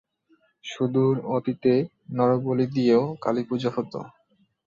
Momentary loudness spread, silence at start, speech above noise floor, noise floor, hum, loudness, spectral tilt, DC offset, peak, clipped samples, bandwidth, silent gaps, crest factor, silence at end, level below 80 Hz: 14 LU; 0.65 s; 42 dB; -66 dBFS; none; -24 LUFS; -8 dB/octave; under 0.1%; -8 dBFS; under 0.1%; 7.4 kHz; none; 16 dB; 0.6 s; -66 dBFS